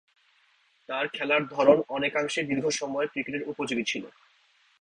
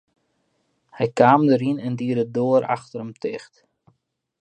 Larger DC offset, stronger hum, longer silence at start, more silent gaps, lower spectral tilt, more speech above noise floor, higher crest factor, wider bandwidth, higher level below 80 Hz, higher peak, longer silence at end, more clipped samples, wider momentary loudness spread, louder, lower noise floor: neither; neither; about the same, 0.9 s vs 0.95 s; neither; second, -3.5 dB/octave vs -8 dB/octave; second, 39 dB vs 50 dB; about the same, 22 dB vs 22 dB; first, 10.5 kHz vs 9.2 kHz; about the same, -70 dBFS vs -68 dBFS; second, -6 dBFS vs 0 dBFS; second, 0.7 s vs 1 s; neither; second, 11 LU vs 15 LU; second, -27 LUFS vs -21 LUFS; second, -66 dBFS vs -70 dBFS